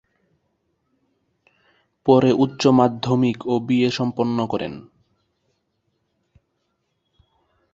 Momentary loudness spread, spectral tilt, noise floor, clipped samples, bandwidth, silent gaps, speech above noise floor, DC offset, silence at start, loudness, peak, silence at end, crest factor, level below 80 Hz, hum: 10 LU; -7 dB/octave; -72 dBFS; under 0.1%; 7.8 kHz; none; 54 dB; under 0.1%; 2.05 s; -19 LUFS; -2 dBFS; 2.9 s; 22 dB; -60 dBFS; none